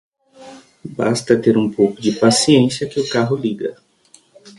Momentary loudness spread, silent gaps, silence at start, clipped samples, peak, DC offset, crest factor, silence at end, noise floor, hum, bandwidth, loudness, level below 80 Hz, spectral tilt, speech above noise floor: 13 LU; none; 0.4 s; under 0.1%; 0 dBFS; under 0.1%; 18 dB; 0.1 s; -52 dBFS; none; 11.5 kHz; -16 LUFS; -56 dBFS; -5 dB/octave; 36 dB